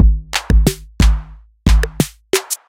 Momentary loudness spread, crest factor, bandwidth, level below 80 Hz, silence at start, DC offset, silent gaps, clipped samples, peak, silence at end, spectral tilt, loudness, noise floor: 6 LU; 14 dB; 16.5 kHz; -16 dBFS; 0 s; under 0.1%; none; under 0.1%; 0 dBFS; 0.15 s; -5 dB/octave; -17 LUFS; -31 dBFS